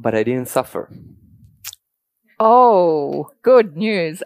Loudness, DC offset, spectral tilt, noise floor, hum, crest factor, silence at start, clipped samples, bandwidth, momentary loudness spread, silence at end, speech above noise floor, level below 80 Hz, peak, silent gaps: -15 LUFS; under 0.1%; -5.5 dB/octave; -72 dBFS; none; 16 dB; 0 s; under 0.1%; 15.5 kHz; 23 LU; 0 s; 56 dB; -62 dBFS; 0 dBFS; none